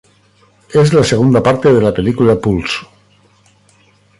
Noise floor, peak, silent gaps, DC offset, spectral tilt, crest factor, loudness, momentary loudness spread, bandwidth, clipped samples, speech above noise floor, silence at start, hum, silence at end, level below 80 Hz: -51 dBFS; 0 dBFS; none; under 0.1%; -6.5 dB/octave; 14 dB; -12 LUFS; 7 LU; 11.5 kHz; under 0.1%; 40 dB; 0.7 s; 50 Hz at -35 dBFS; 1.35 s; -40 dBFS